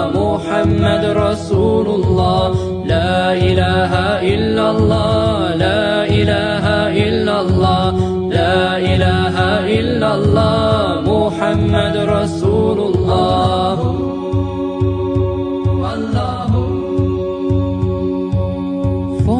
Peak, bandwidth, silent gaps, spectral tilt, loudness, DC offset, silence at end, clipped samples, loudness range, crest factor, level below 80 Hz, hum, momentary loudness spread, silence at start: 0 dBFS; 10 kHz; none; -7 dB/octave; -15 LUFS; under 0.1%; 0 s; under 0.1%; 3 LU; 14 dB; -32 dBFS; none; 5 LU; 0 s